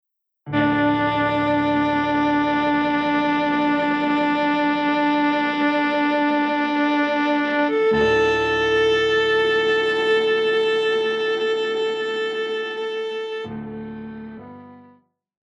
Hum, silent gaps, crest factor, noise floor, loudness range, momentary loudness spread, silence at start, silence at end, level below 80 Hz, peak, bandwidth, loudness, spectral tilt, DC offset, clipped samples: none; none; 14 dB; -56 dBFS; 7 LU; 9 LU; 0.45 s; 0.75 s; -52 dBFS; -8 dBFS; 8 kHz; -20 LUFS; -5.5 dB/octave; under 0.1%; under 0.1%